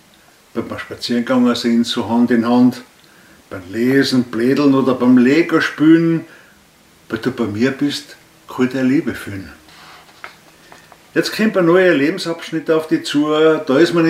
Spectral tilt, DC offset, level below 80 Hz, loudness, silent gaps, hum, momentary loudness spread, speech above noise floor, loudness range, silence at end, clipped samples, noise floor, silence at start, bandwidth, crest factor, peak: -6 dB/octave; under 0.1%; -58 dBFS; -15 LUFS; none; none; 15 LU; 34 dB; 7 LU; 0 s; under 0.1%; -49 dBFS; 0.55 s; 15 kHz; 16 dB; 0 dBFS